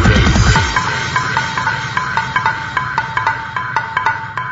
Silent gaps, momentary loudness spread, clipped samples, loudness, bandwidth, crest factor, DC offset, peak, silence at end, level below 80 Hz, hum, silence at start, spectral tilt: none; 8 LU; under 0.1%; -16 LUFS; 7.8 kHz; 16 dB; under 0.1%; 0 dBFS; 0 s; -24 dBFS; none; 0 s; -4.5 dB/octave